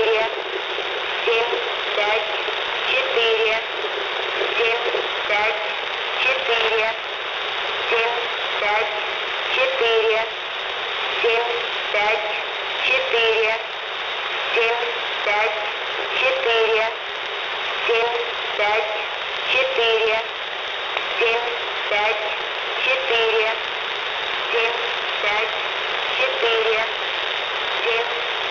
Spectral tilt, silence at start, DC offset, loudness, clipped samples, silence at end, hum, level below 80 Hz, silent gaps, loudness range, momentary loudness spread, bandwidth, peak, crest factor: -1.5 dB/octave; 0 s; under 0.1%; -20 LUFS; under 0.1%; 0 s; none; -60 dBFS; none; 1 LU; 6 LU; 6 kHz; -8 dBFS; 14 dB